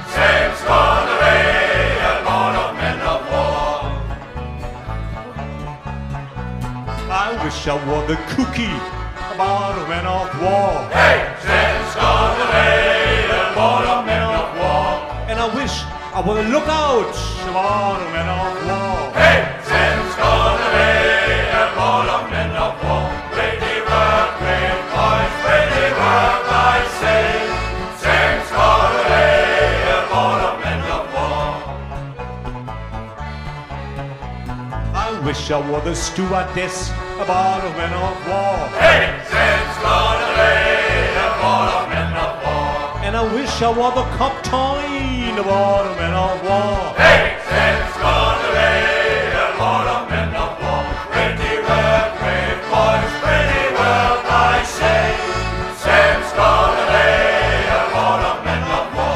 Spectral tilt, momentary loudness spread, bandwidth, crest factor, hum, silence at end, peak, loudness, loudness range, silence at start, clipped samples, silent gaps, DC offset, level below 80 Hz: -4.5 dB/octave; 14 LU; 15 kHz; 16 dB; none; 0 s; -2 dBFS; -16 LUFS; 8 LU; 0 s; under 0.1%; none; under 0.1%; -30 dBFS